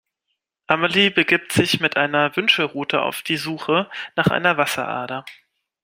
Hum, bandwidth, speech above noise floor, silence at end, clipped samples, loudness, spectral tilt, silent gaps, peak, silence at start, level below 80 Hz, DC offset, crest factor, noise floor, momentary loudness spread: none; 16.5 kHz; 57 dB; 0.5 s; under 0.1%; -19 LUFS; -4 dB/octave; none; 0 dBFS; 0.7 s; -58 dBFS; under 0.1%; 20 dB; -77 dBFS; 9 LU